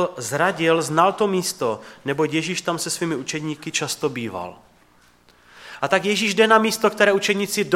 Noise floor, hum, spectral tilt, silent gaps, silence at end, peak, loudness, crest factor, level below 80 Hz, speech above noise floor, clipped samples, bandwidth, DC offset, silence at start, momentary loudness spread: -56 dBFS; none; -3.5 dB/octave; none; 0 s; 0 dBFS; -21 LUFS; 20 dB; -66 dBFS; 35 dB; under 0.1%; 16.5 kHz; under 0.1%; 0 s; 12 LU